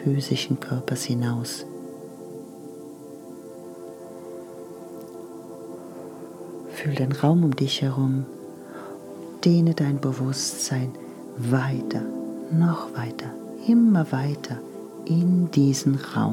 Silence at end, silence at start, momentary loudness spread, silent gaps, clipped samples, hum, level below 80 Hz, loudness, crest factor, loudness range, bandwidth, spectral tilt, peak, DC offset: 0 s; 0 s; 20 LU; none; under 0.1%; none; -74 dBFS; -24 LUFS; 18 dB; 16 LU; 16 kHz; -6 dB/octave; -6 dBFS; under 0.1%